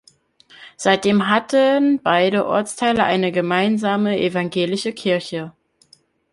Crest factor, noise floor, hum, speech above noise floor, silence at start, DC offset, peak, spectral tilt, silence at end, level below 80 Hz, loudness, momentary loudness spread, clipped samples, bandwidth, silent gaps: 16 dB; -56 dBFS; none; 38 dB; 0.6 s; under 0.1%; -2 dBFS; -5 dB/octave; 0.8 s; -60 dBFS; -18 LUFS; 7 LU; under 0.1%; 11.5 kHz; none